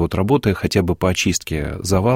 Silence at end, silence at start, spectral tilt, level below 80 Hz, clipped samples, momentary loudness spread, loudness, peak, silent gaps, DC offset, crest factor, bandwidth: 0 s; 0 s; -5 dB/octave; -36 dBFS; under 0.1%; 5 LU; -19 LUFS; -4 dBFS; none; under 0.1%; 14 dB; 16.5 kHz